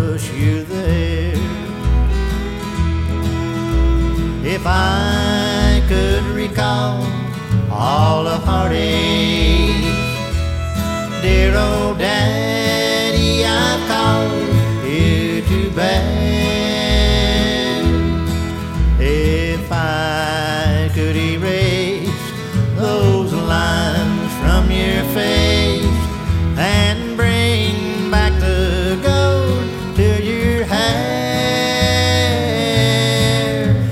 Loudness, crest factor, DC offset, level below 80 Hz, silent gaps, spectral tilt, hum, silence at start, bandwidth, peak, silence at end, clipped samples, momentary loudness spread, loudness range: -16 LUFS; 14 dB; under 0.1%; -22 dBFS; none; -5.5 dB/octave; none; 0 s; 16.5 kHz; -2 dBFS; 0 s; under 0.1%; 6 LU; 2 LU